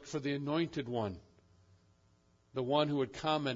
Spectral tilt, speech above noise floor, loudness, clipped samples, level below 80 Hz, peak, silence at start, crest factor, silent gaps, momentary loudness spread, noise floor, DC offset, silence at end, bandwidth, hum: -4.5 dB/octave; 35 dB; -35 LUFS; under 0.1%; -70 dBFS; -16 dBFS; 0 s; 22 dB; none; 10 LU; -70 dBFS; under 0.1%; 0 s; 7.4 kHz; none